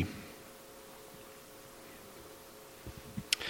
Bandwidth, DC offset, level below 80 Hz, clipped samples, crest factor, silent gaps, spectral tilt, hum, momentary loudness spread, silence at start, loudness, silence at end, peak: 17 kHz; under 0.1%; -64 dBFS; under 0.1%; 40 dB; none; -2.5 dB/octave; none; 9 LU; 0 s; -46 LUFS; 0 s; -4 dBFS